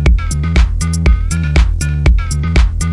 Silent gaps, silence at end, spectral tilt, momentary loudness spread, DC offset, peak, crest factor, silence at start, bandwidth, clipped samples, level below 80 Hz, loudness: none; 0 s; -5.5 dB/octave; 2 LU; under 0.1%; 0 dBFS; 10 dB; 0 s; 11.5 kHz; under 0.1%; -12 dBFS; -14 LUFS